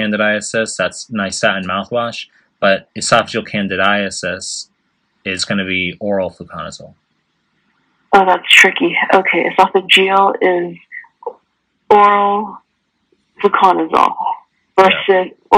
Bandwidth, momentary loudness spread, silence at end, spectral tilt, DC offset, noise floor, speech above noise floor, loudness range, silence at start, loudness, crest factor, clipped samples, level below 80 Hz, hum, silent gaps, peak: 17 kHz; 19 LU; 0 s; -3 dB/octave; under 0.1%; -66 dBFS; 53 dB; 8 LU; 0 s; -13 LUFS; 16 dB; 0.2%; -58 dBFS; none; none; 0 dBFS